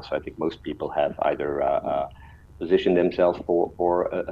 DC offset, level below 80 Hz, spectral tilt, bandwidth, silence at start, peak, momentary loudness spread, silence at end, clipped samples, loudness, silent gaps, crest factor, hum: under 0.1%; -50 dBFS; -8 dB/octave; 7 kHz; 0 s; -6 dBFS; 10 LU; 0 s; under 0.1%; -24 LUFS; none; 18 dB; none